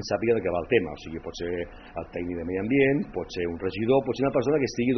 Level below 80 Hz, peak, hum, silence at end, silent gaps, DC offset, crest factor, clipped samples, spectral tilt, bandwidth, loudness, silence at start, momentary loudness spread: -50 dBFS; -6 dBFS; none; 0 s; none; under 0.1%; 20 dB; under 0.1%; -5.5 dB/octave; 6.4 kHz; -27 LUFS; 0 s; 12 LU